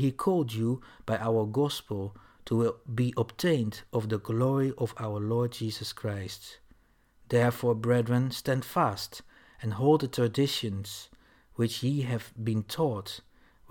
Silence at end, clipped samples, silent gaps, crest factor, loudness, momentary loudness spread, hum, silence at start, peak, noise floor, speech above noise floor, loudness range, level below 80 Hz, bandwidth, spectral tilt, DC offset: 0.5 s; under 0.1%; none; 18 dB; -30 LUFS; 12 LU; none; 0 s; -12 dBFS; -63 dBFS; 34 dB; 3 LU; -62 dBFS; 18 kHz; -6.5 dB/octave; under 0.1%